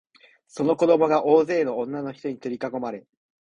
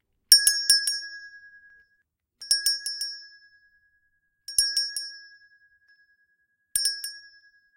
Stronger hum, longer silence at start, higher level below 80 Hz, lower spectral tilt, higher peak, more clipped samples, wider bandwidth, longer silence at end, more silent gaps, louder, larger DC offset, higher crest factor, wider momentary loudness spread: neither; first, 0.55 s vs 0.3 s; about the same, -68 dBFS vs -64 dBFS; first, -7 dB/octave vs 5.5 dB/octave; second, -6 dBFS vs 0 dBFS; neither; second, 10 kHz vs 16.5 kHz; about the same, 0.5 s vs 0.55 s; neither; about the same, -23 LUFS vs -22 LUFS; neither; second, 18 dB vs 28 dB; second, 14 LU vs 23 LU